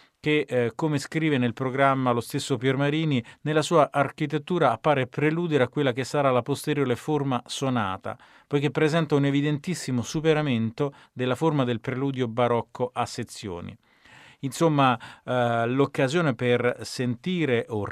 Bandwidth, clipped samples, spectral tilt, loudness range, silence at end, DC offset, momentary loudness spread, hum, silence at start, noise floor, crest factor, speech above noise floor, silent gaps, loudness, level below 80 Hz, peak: 14.5 kHz; under 0.1%; -6 dB/octave; 3 LU; 0 s; under 0.1%; 8 LU; none; 0.25 s; -52 dBFS; 18 dB; 28 dB; none; -25 LUFS; -64 dBFS; -6 dBFS